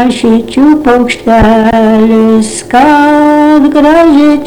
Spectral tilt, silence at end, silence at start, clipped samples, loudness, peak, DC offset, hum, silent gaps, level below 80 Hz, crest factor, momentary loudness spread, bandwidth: -5.5 dB/octave; 0 s; 0 s; 2%; -6 LUFS; 0 dBFS; under 0.1%; none; none; -28 dBFS; 6 dB; 4 LU; 12 kHz